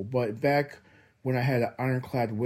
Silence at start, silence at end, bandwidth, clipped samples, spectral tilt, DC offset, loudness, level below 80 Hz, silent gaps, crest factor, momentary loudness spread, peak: 0 s; 0 s; 15.5 kHz; under 0.1%; -8 dB/octave; under 0.1%; -28 LUFS; -66 dBFS; none; 16 dB; 6 LU; -12 dBFS